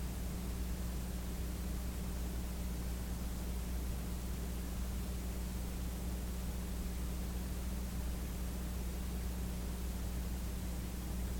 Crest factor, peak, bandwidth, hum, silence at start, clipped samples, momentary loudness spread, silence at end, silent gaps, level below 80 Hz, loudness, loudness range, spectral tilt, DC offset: 12 dB; -28 dBFS; 17.5 kHz; none; 0 s; under 0.1%; 1 LU; 0 s; none; -40 dBFS; -42 LUFS; 0 LU; -5.5 dB/octave; under 0.1%